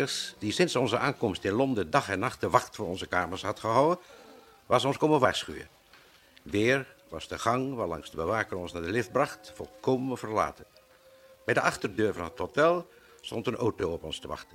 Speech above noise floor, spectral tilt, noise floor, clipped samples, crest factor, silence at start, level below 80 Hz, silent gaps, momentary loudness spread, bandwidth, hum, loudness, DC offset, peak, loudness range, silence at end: 29 dB; -5 dB/octave; -58 dBFS; under 0.1%; 24 dB; 0 s; -58 dBFS; none; 11 LU; 16.5 kHz; none; -29 LUFS; under 0.1%; -6 dBFS; 3 LU; 0.1 s